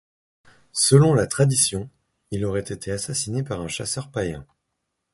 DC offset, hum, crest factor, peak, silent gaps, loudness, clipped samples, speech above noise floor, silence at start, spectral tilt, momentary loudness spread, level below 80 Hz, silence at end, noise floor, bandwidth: under 0.1%; none; 22 dB; -2 dBFS; none; -22 LUFS; under 0.1%; 56 dB; 0.75 s; -4.5 dB/octave; 15 LU; -48 dBFS; 0.7 s; -78 dBFS; 12 kHz